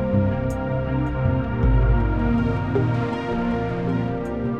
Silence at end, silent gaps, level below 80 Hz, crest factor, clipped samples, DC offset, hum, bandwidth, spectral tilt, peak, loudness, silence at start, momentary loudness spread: 0 s; none; -28 dBFS; 14 dB; under 0.1%; under 0.1%; none; 8.2 kHz; -9.5 dB/octave; -8 dBFS; -23 LUFS; 0 s; 5 LU